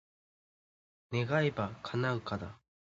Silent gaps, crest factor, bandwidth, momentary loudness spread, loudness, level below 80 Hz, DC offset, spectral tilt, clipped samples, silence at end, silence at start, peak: none; 20 dB; 7.6 kHz; 10 LU; -34 LUFS; -62 dBFS; under 0.1%; -5.5 dB/octave; under 0.1%; 0.45 s; 1.1 s; -16 dBFS